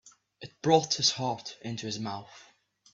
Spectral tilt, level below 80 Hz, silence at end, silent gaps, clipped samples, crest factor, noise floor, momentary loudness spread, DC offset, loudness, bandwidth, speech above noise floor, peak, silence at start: -3.5 dB/octave; -70 dBFS; 0.5 s; none; under 0.1%; 22 dB; -50 dBFS; 17 LU; under 0.1%; -29 LUFS; 7.8 kHz; 21 dB; -8 dBFS; 0.05 s